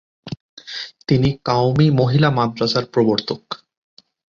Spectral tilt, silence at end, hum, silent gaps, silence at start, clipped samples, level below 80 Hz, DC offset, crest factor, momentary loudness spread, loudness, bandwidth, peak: -7 dB/octave; 0.8 s; none; 0.40-0.57 s; 0.25 s; under 0.1%; -46 dBFS; under 0.1%; 18 dB; 18 LU; -18 LUFS; 7.2 kHz; -2 dBFS